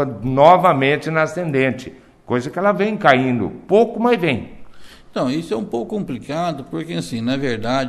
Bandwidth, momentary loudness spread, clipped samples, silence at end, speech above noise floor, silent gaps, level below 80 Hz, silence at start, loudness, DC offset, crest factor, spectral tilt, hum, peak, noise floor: 13.5 kHz; 12 LU; under 0.1%; 0 s; 20 dB; none; -48 dBFS; 0 s; -18 LUFS; under 0.1%; 18 dB; -6.5 dB/octave; none; 0 dBFS; -37 dBFS